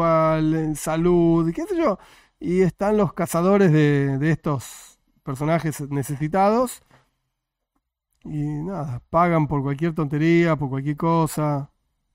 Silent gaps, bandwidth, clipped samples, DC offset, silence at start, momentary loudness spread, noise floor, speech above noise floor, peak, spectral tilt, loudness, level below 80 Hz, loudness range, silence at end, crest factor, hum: none; 16 kHz; under 0.1%; under 0.1%; 0 s; 11 LU; -79 dBFS; 58 dB; -6 dBFS; -7.5 dB/octave; -21 LUFS; -48 dBFS; 5 LU; 0.5 s; 16 dB; none